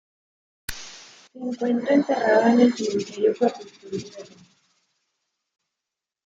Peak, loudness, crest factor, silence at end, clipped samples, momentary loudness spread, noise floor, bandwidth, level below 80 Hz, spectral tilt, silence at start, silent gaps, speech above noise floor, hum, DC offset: -6 dBFS; -21 LUFS; 20 dB; 2 s; under 0.1%; 23 LU; -87 dBFS; 16 kHz; -58 dBFS; -5 dB/octave; 0.7 s; none; 65 dB; none; under 0.1%